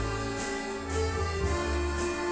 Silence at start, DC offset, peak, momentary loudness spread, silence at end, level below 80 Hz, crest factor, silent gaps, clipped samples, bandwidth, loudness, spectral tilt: 0 s; under 0.1%; -18 dBFS; 3 LU; 0 s; -36 dBFS; 12 dB; none; under 0.1%; 8 kHz; -31 LUFS; -5 dB/octave